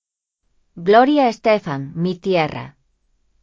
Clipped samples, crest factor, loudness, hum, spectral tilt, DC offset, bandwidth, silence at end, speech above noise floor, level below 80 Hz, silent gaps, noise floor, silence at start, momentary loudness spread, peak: under 0.1%; 20 dB; -17 LUFS; none; -7 dB/octave; under 0.1%; 7.6 kHz; 0.75 s; 56 dB; -58 dBFS; none; -73 dBFS; 0.75 s; 12 LU; 0 dBFS